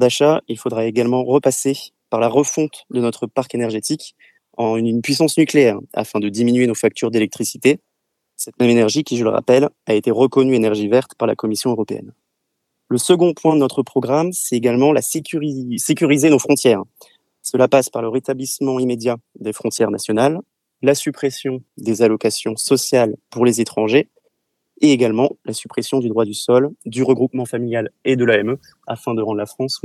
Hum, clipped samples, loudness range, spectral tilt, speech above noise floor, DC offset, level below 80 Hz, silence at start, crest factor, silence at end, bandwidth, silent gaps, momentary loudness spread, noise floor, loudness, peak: none; under 0.1%; 3 LU; -5 dB/octave; 58 dB; under 0.1%; -68 dBFS; 0 s; 18 dB; 0.05 s; 14.5 kHz; none; 10 LU; -74 dBFS; -17 LUFS; 0 dBFS